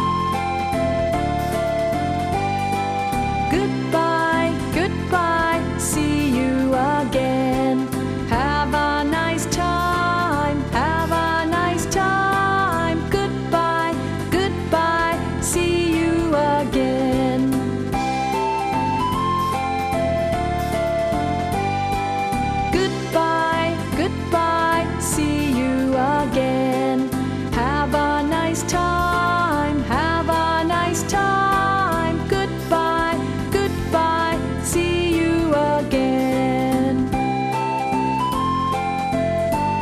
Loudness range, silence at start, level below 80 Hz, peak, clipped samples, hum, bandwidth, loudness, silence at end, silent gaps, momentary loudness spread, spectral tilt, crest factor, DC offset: 2 LU; 0 s; -36 dBFS; -4 dBFS; under 0.1%; none; 15.5 kHz; -20 LUFS; 0 s; none; 4 LU; -5 dB/octave; 14 dB; under 0.1%